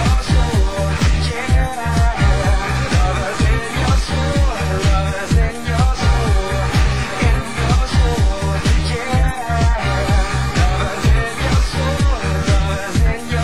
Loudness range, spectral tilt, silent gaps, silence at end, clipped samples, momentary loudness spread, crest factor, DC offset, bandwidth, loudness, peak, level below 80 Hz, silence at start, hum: 0 LU; -5.5 dB/octave; none; 0 s; under 0.1%; 3 LU; 12 dB; 3%; 13 kHz; -17 LUFS; -2 dBFS; -18 dBFS; 0 s; none